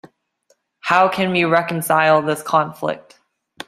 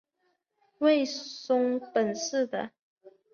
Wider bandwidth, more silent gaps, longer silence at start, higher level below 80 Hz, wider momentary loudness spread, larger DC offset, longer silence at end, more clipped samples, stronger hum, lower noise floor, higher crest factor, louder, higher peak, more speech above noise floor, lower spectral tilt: first, 15.5 kHz vs 7.2 kHz; second, none vs 2.79-2.96 s; second, 0.05 s vs 0.8 s; first, -64 dBFS vs -78 dBFS; about the same, 11 LU vs 11 LU; neither; first, 0.7 s vs 0.25 s; neither; neither; second, -63 dBFS vs -76 dBFS; about the same, 18 dB vs 18 dB; first, -17 LUFS vs -28 LUFS; first, -2 dBFS vs -12 dBFS; about the same, 46 dB vs 48 dB; first, -5 dB/octave vs -3.5 dB/octave